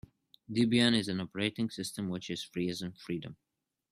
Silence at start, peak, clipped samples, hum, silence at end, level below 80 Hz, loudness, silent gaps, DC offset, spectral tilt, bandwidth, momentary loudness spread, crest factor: 0.5 s; -12 dBFS; under 0.1%; none; 0.6 s; -68 dBFS; -33 LUFS; none; under 0.1%; -5 dB/octave; 13.5 kHz; 13 LU; 22 dB